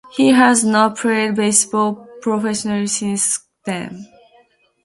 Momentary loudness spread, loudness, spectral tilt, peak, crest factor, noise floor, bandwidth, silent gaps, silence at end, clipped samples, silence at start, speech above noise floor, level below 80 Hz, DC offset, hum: 14 LU; -16 LUFS; -3.5 dB/octave; 0 dBFS; 18 dB; -55 dBFS; 11.5 kHz; none; 0.8 s; under 0.1%; 0.15 s; 38 dB; -62 dBFS; under 0.1%; none